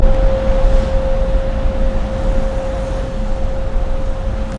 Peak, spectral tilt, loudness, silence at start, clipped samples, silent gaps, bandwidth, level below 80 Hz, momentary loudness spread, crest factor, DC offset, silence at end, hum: 0 dBFS; -7.5 dB/octave; -20 LUFS; 0 s; under 0.1%; none; 7.6 kHz; -16 dBFS; 6 LU; 14 dB; under 0.1%; 0 s; none